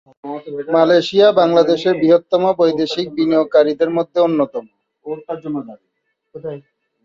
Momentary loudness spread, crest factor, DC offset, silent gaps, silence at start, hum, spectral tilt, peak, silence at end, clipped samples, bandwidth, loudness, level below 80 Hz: 18 LU; 14 dB; under 0.1%; none; 0.25 s; none; -6.5 dB/octave; -2 dBFS; 0.45 s; under 0.1%; 7.6 kHz; -15 LUFS; -62 dBFS